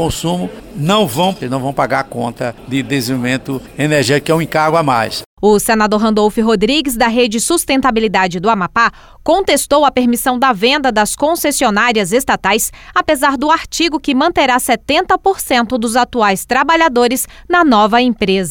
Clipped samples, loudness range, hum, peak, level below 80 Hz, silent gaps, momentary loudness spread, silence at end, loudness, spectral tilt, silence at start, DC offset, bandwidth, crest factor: under 0.1%; 4 LU; none; -2 dBFS; -38 dBFS; 5.26-5.37 s; 7 LU; 0 s; -13 LUFS; -4 dB/octave; 0 s; under 0.1%; 19 kHz; 12 dB